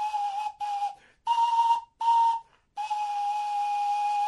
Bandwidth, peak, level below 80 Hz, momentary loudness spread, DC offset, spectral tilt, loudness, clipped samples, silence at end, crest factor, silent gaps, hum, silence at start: 11.5 kHz; -14 dBFS; -74 dBFS; 11 LU; under 0.1%; 1.5 dB/octave; -27 LUFS; under 0.1%; 0 s; 12 dB; none; none; 0 s